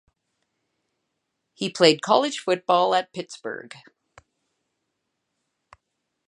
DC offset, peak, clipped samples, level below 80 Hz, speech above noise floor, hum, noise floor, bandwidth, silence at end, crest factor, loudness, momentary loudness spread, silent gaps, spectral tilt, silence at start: under 0.1%; -2 dBFS; under 0.1%; -74 dBFS; 56 dB; none; -79 dBFS; 11 kHz; 2.6 s; 24 dB; -21 LUFS; 16 LU; none; -3.5 dB/octave; 1.6 s